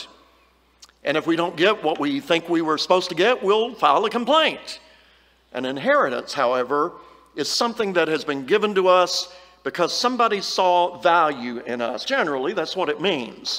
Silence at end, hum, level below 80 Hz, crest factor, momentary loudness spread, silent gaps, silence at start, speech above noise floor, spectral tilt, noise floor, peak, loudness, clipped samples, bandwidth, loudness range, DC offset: 0 s; none; -66 dBFS; 18 dB; 11 LU; none; 0 s; 37 dB; -3.5 dB/octave; -58 dBFS; -4 dBFS; -21 LUFS; under 0.1%; 16 kHz; 3 LU; under 0.1%